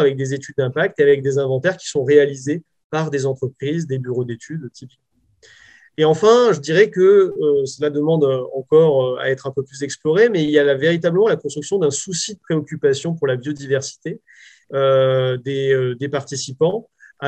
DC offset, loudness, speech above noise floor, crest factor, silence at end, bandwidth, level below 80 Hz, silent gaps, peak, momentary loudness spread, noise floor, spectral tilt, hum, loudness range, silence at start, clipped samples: under 0.1%; -18 LUFS; 35 dB; 18 dB; 0 s; 9.2 kHz; -66 dBFS; 2.84-2.90 s; 0 dBFS; 13 LU; -53 dBFS; -5.5 dB/octave; none; 6 LU; 0 s; under 0.1%